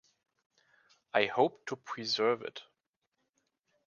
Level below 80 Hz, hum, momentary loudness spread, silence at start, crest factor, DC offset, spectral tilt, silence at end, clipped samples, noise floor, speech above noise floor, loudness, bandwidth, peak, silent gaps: -82 dBFS; none; 14 LU; 1.15 s; 26 dB; under 0.1%; -4 dB/octave; 1.25 s; under 0.1%; -84 dBFS; 51 dB; -32 LUFS; 7.2 kHz; -10 dBFS; none